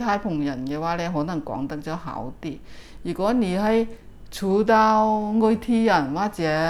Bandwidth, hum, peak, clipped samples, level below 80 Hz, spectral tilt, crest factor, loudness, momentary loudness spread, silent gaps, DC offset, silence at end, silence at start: 13.5 kHz; none; -6 dBFS; under 0.1%; -46 dBFS; -6.5 dB/octave; 16 dB; -23 LUFS; 15 LU; none; under 0.1%; 0 s; 0 s